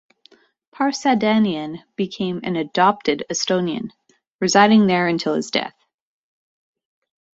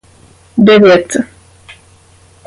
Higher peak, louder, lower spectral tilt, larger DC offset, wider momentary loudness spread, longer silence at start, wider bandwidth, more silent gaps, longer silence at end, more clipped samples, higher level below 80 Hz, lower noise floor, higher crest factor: about the same, -2 dBFS vs 0 dBFS; second, -19 LUFS vs -9 LUFS; about the same, -4.5 dB/octave vs -5.5 dB/octave; neither; about the same, 13 LU vs 14 LU; first, 0.8 s vs 0.55 s; second, 8 kHz vs 11.5 kHz; first, 4.27-4.39 s vs none; first, 1.7 s vs 1.2 s; neither; second, -62 dBFS vs -48 dBFS; first, -56 dBFS vs -44 dBFS; first, 18 dB vs 12 dB